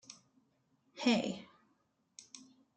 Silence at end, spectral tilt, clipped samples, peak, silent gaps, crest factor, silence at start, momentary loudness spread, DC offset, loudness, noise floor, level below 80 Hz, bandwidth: 0.35 s; -4 dB/octave; under 0.1%; -18 dBFS; none; 22 dB; 0.1 s; 25 LU; under 0.1%; -35 LUFS; -77 dBFS; -82 dBFS; 9.2 kHz